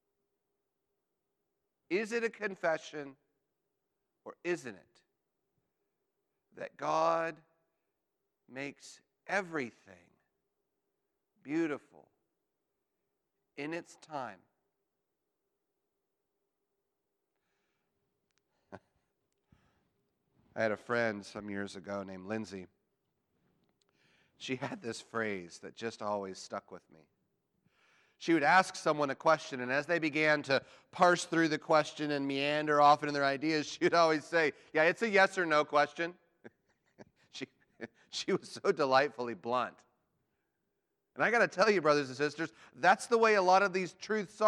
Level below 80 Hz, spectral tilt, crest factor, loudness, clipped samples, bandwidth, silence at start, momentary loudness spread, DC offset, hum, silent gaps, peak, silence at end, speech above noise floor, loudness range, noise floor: -84 dBFS; -4.5 dB/octave; 22 dB; -32 LUFS; under 0.1%; 12 kHz; 1.9 s; 17 LU; under 0.1%; none; none; -12 dBFS; 0 s; 54 dB; 15 LU; -86 dBFS